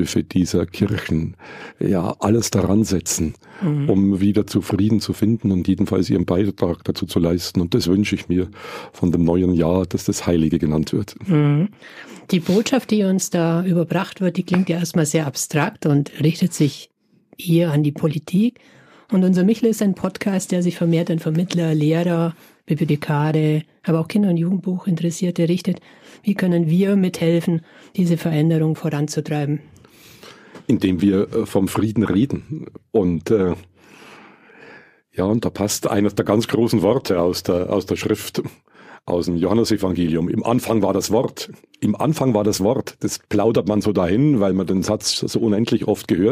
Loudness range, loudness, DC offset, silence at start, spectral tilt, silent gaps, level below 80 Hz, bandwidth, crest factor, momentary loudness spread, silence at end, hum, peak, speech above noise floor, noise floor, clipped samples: 2 LU; -19 LUFS; under 0.1%; 0 s; -6 dB/octave; none; -48 dBFS; 15.5 kHz; 18 dB; 7 LU; 0 s; none; -2 dBFS; 28 dB; -46 dBFS; under 0.1%